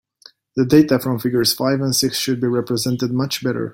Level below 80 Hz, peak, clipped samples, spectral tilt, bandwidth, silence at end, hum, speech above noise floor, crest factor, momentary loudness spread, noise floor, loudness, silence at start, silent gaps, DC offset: -54 dBFS; -2 dBFS; under 0.1%; -4.5 dB/octave; 17 kHz; 0 s; none; 32 dB; 16 dB; 7 LU; -50 dBFS; -18 LUFS; 0.55 s; none; under 0.1%